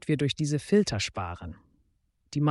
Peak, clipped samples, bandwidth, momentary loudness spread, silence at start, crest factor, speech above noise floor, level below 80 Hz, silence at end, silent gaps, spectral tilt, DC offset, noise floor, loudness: -12 dBFS; under 0.1%; 11.5 kHz; 14 LU; 0.05 s; 16 dB; 44 dB; -54 dBFS; 0 s; none; -5.5 dB/octave; under 0.1%; -71 dBFS; -28 LUFS